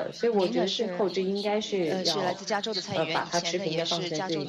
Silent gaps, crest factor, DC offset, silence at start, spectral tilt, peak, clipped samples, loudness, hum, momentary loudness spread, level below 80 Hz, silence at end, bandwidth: none; 16 dB; under 0.1%; 0 s; -4 dB/octave; -12 dBFS; under 0.1%; -28 LUFS; none; 3 LU; -70 dBFS; 0 s; 13.5 kHz